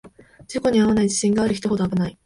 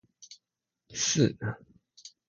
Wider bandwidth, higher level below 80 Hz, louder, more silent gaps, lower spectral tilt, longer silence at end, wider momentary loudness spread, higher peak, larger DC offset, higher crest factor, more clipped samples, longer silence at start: about the same, 11.5 kHz vs 10.5 kHz; first, -48 dBFS vs -64 dBFS; first, -20 LUFS vs -29 LUFS; neither; first, -5.5 dB/octave vs -4 dB/octave; about the same, 0.15 s vs 0.2 s; second, 6 LU vs 25 LU; about the same, -8 dBFS vs -10 dBFS; neither; second, 14 dB vs 22 dB; neither; second, 0.05 s vs 0.2 s